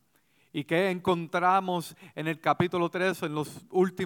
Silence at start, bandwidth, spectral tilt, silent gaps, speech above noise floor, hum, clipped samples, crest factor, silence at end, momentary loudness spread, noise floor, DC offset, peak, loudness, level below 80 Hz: 0.55 s; 18 kHz; -6 dB/octave; none; 40 dB; none; under 0.1%; 18 dB; 0 s; 10 LU; -68 dBFS; under 0.1%; -10 dBFS; -28 LUFS; -68 dBFS